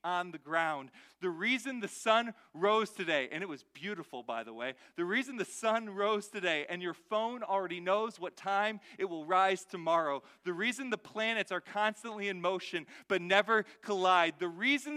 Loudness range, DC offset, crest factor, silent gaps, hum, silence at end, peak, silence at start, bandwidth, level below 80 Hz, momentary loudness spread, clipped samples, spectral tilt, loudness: 3 LU; under 0.1%; 22 dB; none; none; 0 s; -12 dBFS; 0.05 s; 15 kHz; -86 dBFS; 12 LU; under 0.1%; -3.5 dB/octave; -33 LUFS